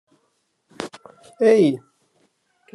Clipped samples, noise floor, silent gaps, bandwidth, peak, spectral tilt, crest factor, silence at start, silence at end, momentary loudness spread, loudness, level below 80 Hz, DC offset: under 0.1%; -69 dBFS; none; 11.5 kHz; -4 dBFS; -6.5 dB/octave; 18 dB; 0.8 s; 0.95 s; 19 LU; -18 LUFS; -76 dBFS; under 0.1%